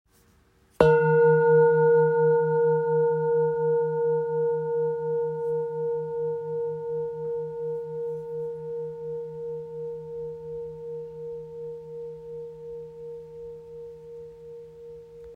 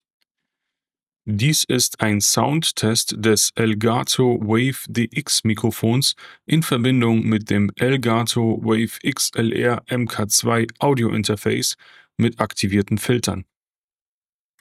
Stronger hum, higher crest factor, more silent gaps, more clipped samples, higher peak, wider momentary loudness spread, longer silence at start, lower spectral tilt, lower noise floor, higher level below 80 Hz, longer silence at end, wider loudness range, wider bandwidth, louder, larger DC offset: neither; about the same, 24 dB vs 20 dB; neither; neither; about the same, -2 dBFS vs 0 dBFS; first, 22 LU vs 6 LU; second, 0.8 s vs 1.25 s; first, -9 dB/octave vs -4 dB/octave; second, -61 dBFS vs under -90 dBFS; about the same, -58 dBFS vs -58 dBFS; second, 0 s vs 1.2 s; first, 18 LU vs 3 LU; second, 4.7 kHz vs 16 kHz; second, -25 LUFS vs -19 LUFS; neither